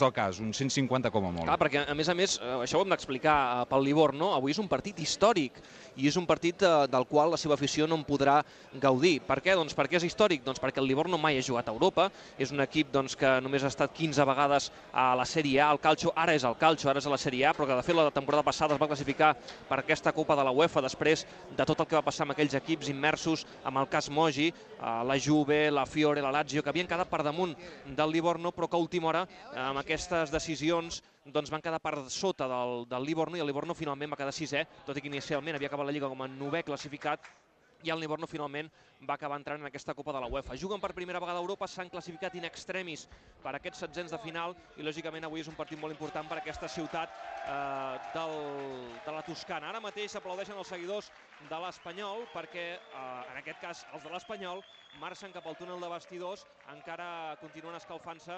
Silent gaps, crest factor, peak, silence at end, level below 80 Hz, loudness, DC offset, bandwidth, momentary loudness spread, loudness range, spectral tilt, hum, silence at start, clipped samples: none; 22 dB; -10 dBFS; 0 s; -60 dBFS; -31 LUFS; under 0.1%; 9 kHz; 15 LU; 13 LU; -4.5 dB/octave; none; 0 s; under 0.1%